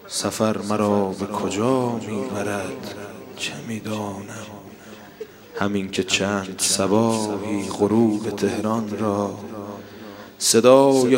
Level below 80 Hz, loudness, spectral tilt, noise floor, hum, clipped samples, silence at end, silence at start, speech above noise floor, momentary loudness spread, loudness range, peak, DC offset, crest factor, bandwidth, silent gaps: -62 dBFS; -21 LUFS; -4 dB/octave; -42 dBFS; none; under 0.1%; 0 s; 0 s; 21 dB; 19 LU; 9 LU; 0 dBFS; under 0.1%; 22 dB; 16.5 kHz; none